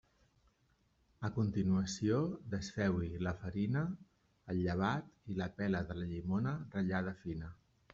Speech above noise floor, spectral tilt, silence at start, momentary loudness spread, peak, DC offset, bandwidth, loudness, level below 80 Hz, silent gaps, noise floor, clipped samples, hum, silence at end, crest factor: 38 dB; -7 dB/octave; 1.2 s; 9 LU; -22 dBFS; under 0.1%; 7.6 kHz; -38 LUFS; -62 dBFS; none; -75 dBFS; under 0.1%; none; 0.4 s; 16 dB